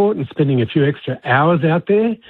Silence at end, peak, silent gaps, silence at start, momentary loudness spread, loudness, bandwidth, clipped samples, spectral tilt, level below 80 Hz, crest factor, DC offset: 0.15 s; -2 dBFS; none; 0 s; 5 LU; -16 LUFS; 4.3 kHz; under 0.1%; -10.5 dB/octave; -56 dBFS; 14 dB; under 0.1%